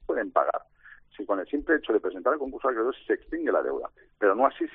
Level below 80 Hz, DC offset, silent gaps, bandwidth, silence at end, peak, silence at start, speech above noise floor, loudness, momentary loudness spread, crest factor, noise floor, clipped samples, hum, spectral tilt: -58 dBFS; under 0.1%; none; 3.9 kHz; 0.05 s; -8 dBFS; 0 s; 27 dB; -27 LUFS; 8 LU; 20 dB; -54 dBFS; under 0.1%; 50 Hz at -70 dBFS; -2 dB/octave